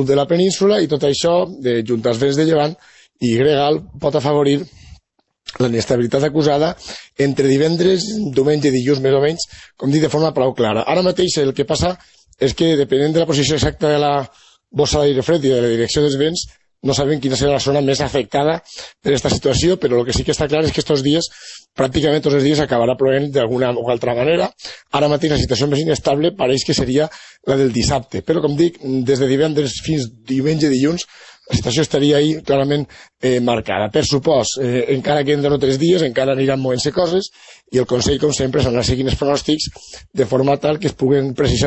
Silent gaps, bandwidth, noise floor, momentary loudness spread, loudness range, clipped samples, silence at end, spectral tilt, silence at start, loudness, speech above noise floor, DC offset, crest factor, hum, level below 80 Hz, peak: none; 8.4 kHz; -60 dBFS; 7 LU; 2 LU; under 0.1%; 0 s; -5.5 dB/octave; 0 s; -17 LUFS; 43 dB; under 0.1%; 14 dB; none; -38 dBFS; -2 dBFS